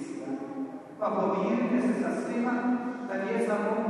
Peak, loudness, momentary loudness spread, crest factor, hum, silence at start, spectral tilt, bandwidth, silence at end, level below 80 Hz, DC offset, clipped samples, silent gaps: -16 dBFS; -30 LUFS; 9 LU; 14 dB; none; 0 s; -7 dB/octave; 11 kHz; 0 s; -78 dBFS; under 0.1%; under 0.1%; none